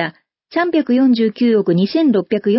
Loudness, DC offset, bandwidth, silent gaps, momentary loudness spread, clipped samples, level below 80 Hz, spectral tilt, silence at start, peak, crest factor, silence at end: -15 LUFS; under 0.1%; 5.8 kHz; none; 6 LU; under 0.1%; -64 dBFS; -11.5 dB/octave; 0 s; -4 dBFS; 10 dB; 0 s